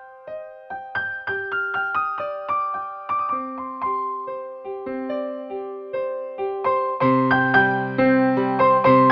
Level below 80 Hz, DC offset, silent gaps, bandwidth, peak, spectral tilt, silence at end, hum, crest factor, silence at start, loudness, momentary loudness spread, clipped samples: -60 dBFS; under 0.1%; none; 5.6 kHz; -4 dBFS; -9 dB/octave; 0 s; none; 18 dB; 0 s; -22 LUFS; 15 LU; under 0.1%